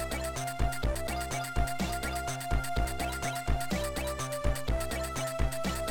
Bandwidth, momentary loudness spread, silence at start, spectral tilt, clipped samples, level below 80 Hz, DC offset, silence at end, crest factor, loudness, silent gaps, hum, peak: 19 kHz; 2 LU; 0 s; -4.5 dB/octave; under 0.1%; -36 dBFS; under 0.1%; 0 s; 16 dB; -33 LUFS; none; none; -16 dBFS